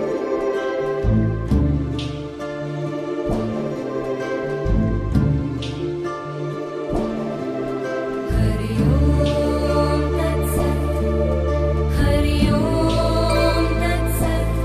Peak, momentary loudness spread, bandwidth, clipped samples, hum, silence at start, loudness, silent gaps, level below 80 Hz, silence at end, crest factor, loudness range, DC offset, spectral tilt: -6 dBFS; 8 LU; 14 kHz; under 0.1%; none; 0 s; -21 LUFS; none; -26 dBFS; 0 s; 14 dB; 5 LU; under 0.1%; -7 dB/octave